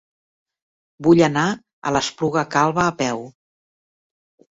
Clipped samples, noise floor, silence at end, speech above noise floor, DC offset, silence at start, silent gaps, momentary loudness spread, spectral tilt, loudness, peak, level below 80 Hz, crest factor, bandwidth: under 0.1%; under -90 dBFS; 1.25 s; over 72 dB; under 0.1%; 1 s; 1.73-1.82 s; 9 LU; -5 dB/octave; -19 LUFS; -2 dBFS; -54 dBFS; 20 dB; 8 kHz